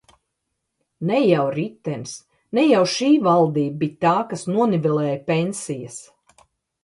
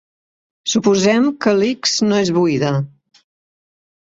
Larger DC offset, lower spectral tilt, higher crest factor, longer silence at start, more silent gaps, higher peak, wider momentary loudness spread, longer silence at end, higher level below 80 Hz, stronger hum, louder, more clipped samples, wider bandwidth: neither; first, -6 dB/octave vs -4.5 dB/octave; about the same, 18 dB vs 16 dB; first, 1 s vs 0.65 s; neither; about the same, -4 dBFS vs -2 dBFS; first, 14 LU vs 8 LU; second, 0.8 s vs 1.25 s; second, -66 dBFS vs -56 dBFS; neither; second, -20 LUFS vs -16 LUFS; neither; first, 11.5 kHz vs 8 kHz